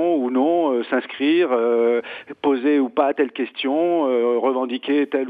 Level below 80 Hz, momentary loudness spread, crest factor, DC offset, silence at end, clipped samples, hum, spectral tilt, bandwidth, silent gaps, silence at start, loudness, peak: -74 dBFS; 6 LU; 14 dB; under 0.1%; 0 s; under 0.1%; none; -7 dB/octave; 4.9 kHz; none; 0 s; -20 LUFS; -6 dBFS